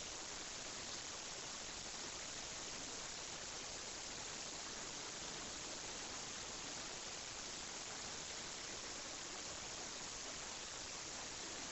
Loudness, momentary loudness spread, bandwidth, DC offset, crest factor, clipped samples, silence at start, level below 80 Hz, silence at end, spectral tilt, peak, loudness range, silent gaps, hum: -46 LUFS; 1 LU; over 20 kHz; under 0.1%; 14 dB; under 0.1%; 0 s; -68 dBFS; 0 s; -0.5 dB/octave; -34 dBFS; 0 LU; none; none